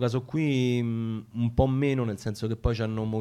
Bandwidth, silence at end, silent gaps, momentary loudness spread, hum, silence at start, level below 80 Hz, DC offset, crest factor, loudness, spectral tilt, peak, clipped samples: 13 kHz; 0 s; none; 7 LU; none; 0 s; -42 dBFS; under 0.1%; 18 dB; -28 LUFS; -7.5 dB/octave; -10 dBFS; under 0.1%